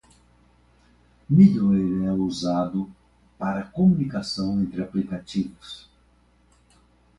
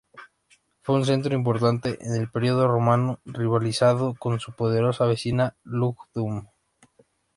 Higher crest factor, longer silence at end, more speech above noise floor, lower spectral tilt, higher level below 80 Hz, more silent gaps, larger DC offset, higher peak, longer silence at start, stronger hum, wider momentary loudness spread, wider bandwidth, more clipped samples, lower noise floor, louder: about the same, 20 dB vs 18 dB; first, 1.4 s vs 0.9 s; about the same, 38 dB vs 40 dB; about the same, -7.5 dB/octave vs -7 dB/octave; first, -52 dBFS vs -58 dBFS; neither; neither; about the same, -4 dBFS vs -6 dBFS; first, 1.3 s vs 0.15 s; first, 60 Hz at -45 dBFS vs none; first, 16 LU vs 8 LU; about the same, 10.5 kHz vs 11.5 kHz; neither; about the same, -60 dBFS vs -63 dBFS; about the same, -23 LUFS vs -24 LUFS